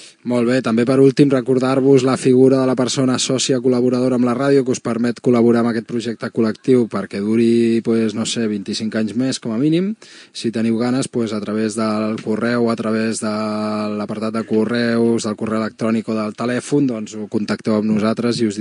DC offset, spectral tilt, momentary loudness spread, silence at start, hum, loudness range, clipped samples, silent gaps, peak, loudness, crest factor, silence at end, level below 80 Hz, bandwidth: under 0.1%; -5.5 dB/octave; 9 LU; 0 s; none; 5 LU; under 0.1%; none; 0 dBFS; -18 LUFS; 16 dB; 0 s; -68 dBFS; 11 kHz